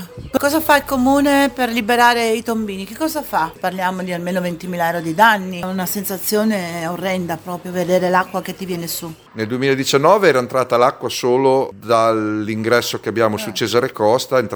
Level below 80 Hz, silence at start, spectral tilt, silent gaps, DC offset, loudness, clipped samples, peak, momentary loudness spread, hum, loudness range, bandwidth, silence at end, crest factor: -50 dBFS; 0 s; -4.5 dB/octave; none; under 0.1%; -17 LUFS; under 0.1%; 0 dBFS; 11 LU; none; 4 LU; over 20 kHz; 0 s; 18 dB